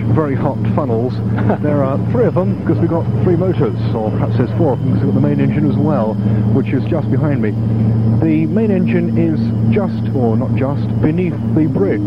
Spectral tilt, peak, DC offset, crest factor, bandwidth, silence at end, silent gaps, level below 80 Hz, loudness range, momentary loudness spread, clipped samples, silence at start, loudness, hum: -11 dB/octave; 0 dBFS; 0.9%; 14 dB; 5.4 kHz; 0 s; none; -38 dBFS; 1 LU; 3 LU; under 0.1%; 0 s; -15 LUFS; none